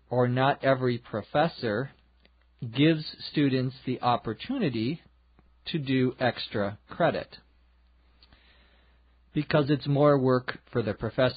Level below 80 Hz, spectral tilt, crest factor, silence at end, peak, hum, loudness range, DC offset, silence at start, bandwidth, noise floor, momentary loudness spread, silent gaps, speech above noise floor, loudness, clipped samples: -58 dBFS; -11 dB/octave; 18 dB; 0 s; -10 dBFS; none; 4 LU; under 0.1%; 0.1 s; 5 kHz; -62 dBFS; 10 LU; none; 35 dB; -27 LUFS; under 0.1%